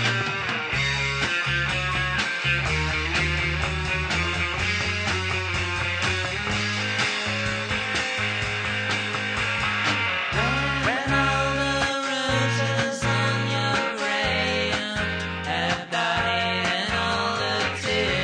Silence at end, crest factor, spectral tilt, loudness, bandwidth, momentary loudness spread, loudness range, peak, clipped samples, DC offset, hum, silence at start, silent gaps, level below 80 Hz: 0 s; 16 dB; -4 dB/octave; -23 LUFS; 10 kHz; 3 LU; 1 LU; -10 dBFS; under 0.1%; under 0.1%; none; 0 s; none; -40 dBFS